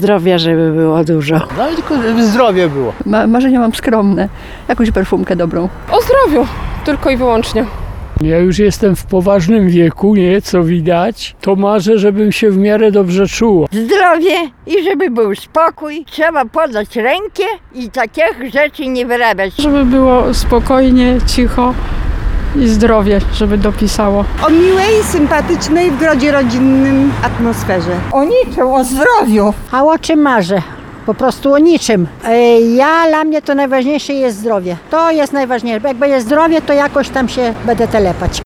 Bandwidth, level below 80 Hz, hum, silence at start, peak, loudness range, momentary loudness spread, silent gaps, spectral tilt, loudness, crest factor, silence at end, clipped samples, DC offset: 19.5 kHz; -24 dBFS; none; 0 s; 0 dBFS; 3 LU; 7 LU; none; -6 dB/octave; -11 LUFS; 10 dB; 0 s; under 0.1%; under 0.1%